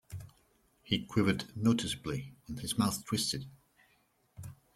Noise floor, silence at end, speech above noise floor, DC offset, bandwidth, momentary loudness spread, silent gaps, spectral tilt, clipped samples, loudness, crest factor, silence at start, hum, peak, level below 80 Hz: -72 dBFS; 0.2 s; 39 dB; under 0.1%; 16 kHz; 19 LU; none; -4.5 dB/octave; under 0.1%; -33 LUFS; 22 dB; 0.1 s; none; -14 dBFS; -60 dBFS